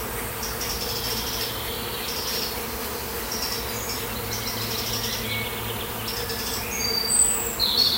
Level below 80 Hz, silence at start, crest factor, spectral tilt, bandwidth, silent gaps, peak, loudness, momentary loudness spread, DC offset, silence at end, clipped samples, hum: -42 dBFS; 0 s; 18 dB; -1.5 dB/octave; 16 kHz; none; -8 dBFS; -25 LUFS; 9 LU; under 0.1%; 0 s; under 0.1%; none